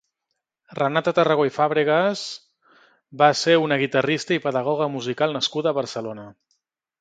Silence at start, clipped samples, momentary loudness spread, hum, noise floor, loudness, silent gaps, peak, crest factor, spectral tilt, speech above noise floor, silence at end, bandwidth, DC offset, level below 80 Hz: 0.7 s; under 0.1%; 13 LU; none; -80 dBFS; -21 LUFS; none; -2 dBFS; 22 dB; -4.5 dB/octave; 59 dB; 0.7 s; 9.2 kHz; under 0.1%; -68 dBFS